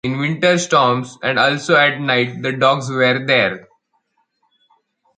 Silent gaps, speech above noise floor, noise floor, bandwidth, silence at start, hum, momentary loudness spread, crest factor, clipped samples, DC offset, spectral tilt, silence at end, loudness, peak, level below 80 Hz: none; 50 dB; -66 dBFS; 9.4 kHz; 0.05 s; none; 7 LU; 18 dB; under 0.1%; under 0.1%; -4.5 dB/octave; 1.6 s; -16 LUFS; 0 dBFS; -60 dBFS